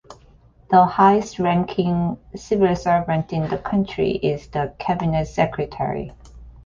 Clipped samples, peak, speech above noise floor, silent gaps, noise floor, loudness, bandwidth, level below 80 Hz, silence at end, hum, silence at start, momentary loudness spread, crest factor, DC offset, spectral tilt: under 0.1%; -2 dBFS; 31 dB; none; -51 dBFS; -20 LUFS; 7.4 kHz; -44 dBFS; 0.05 s; none; 0.1 s; 10 LU; 18 dB; under 0.1%; -7.5 dB/octave